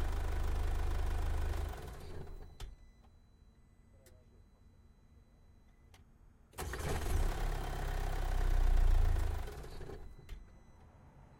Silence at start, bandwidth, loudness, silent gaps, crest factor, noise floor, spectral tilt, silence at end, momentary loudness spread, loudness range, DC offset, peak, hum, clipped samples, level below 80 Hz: 0 s; 16 kHz; -40 LUFS; none; 16 dB; -63 dBFS; -5.5 dB/octave; 0.05 s; 20 LU; 18 LU; under 0.1%; -20 dBFS; none; under 0.1%; -38 dBFS